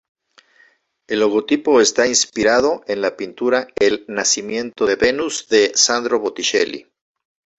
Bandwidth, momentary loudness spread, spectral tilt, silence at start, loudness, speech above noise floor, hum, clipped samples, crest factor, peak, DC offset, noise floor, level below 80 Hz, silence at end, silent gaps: 8.2 kHz; 9 LU; -1.5 dB/octave; 1.1 s; -17 LUFS; 39 dB; none; under 0.1%; 18 dB; 0 dBFS; under 0.1%; -56 dBFS; -54 dBFS; 0.75 s; none